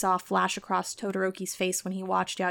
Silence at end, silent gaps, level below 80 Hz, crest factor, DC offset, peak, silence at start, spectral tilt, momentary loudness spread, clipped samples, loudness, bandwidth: 0 s; none; -68 dBFS; 16 dB; under 0.1%; -14 dBFS; 0 s; -3.5 dB/octave; 5 LU; under 0.1%; -29 LUFS; 19 kHz